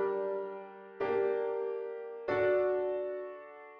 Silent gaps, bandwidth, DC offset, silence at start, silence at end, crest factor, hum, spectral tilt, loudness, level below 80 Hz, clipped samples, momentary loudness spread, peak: none; 5.2 kHz; under 0.1%; 0 s; 0 s; 14 dB; none; -8 dB/octave; -34 LUFS; -74 dBFS; under 0.1%; 15 LU; -20 dBFS